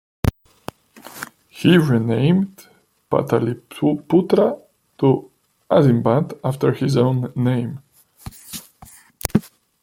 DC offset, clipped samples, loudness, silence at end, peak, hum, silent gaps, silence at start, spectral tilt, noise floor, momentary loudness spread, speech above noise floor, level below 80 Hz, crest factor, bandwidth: under 0.1%; under 0.1%; -19 LUFS; 0.35 s; 0 dBFS; none; none; 0.25 s; -7 dB/octave; -47 dBFS; 22 LU; 29 dB; -44 dBFS; 20 dB; 16.5 kHz